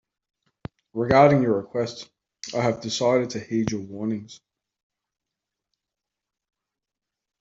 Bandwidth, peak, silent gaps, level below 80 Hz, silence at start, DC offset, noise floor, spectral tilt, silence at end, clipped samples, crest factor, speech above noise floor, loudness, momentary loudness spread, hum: 7.8 kHz; -2 dBFS; none; -58 dBFS; 0.95 s; under 0.1%; -87 dBFS; -6 dB/octave; 3.05 s; under 0.1%; 24 dB; 64 dB; -23 LUFS; 23 LU; none